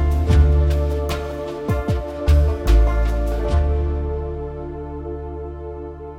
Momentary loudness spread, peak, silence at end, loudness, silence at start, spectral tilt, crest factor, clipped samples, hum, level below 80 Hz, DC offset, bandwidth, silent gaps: 14 LU; -4 dBFS; 0 s; -21 LUFS; 0 s; -8 dB/octave; 16 dB; under 0.1%; none; -20 dBFS; under 0.1%; 9.4 kHz; none